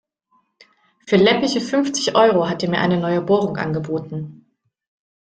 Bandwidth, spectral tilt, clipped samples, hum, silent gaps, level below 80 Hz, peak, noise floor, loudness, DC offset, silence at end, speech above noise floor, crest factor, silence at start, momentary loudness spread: 9.2 kHz; -5 dB/octave; under 0.1%; none; none; -58 dBFS; -2 dBFS; -64 dBFS; -18 LUFS; under 0.1%; 1 s; 46 dB; 18 dB; 1.05 s; 11 LU